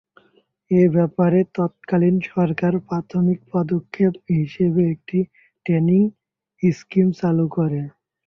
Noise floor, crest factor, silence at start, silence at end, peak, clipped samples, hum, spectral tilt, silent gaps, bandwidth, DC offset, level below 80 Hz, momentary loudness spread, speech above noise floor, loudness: -60 dBFS; 16 dB; 0.7 s; 0.4 s; -4 dBFS; under 0.1%; none; -10 dB/octave; none; 6.4 kHz; under 0.1%; -58 dBFS; 7 LU; 42 dB; -20 LUFS